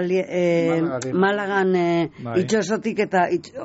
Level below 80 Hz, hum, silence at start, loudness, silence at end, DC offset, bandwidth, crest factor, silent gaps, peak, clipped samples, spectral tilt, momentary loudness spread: -62 dBFS; none; 0 s; -21 LUFS; 0 s; under 0.1%; 8 kHz; 12 dB; none; -8 dBFS; under 0.1%; -5.5 dB/octave; 4 LU